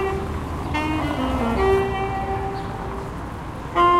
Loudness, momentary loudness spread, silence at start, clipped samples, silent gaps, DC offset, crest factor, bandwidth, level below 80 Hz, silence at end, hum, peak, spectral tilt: -24 LUFS; 12 LU; 0 s; under 0.1%; none; under 0.1%; 16 dB; 15 kHz; -34 dBFS; 0 s; none; -6 dBFS; -6.5 dB/octave